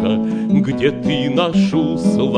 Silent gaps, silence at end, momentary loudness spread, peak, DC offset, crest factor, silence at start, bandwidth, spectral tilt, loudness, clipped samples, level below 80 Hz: none; 0 s; 3 LU; -2 dBFS; under 0.1%; 14 dB; 0 s; 10 kHz; -7 dB/octave; -17 LUFS; under 0.1%; -46 dBFS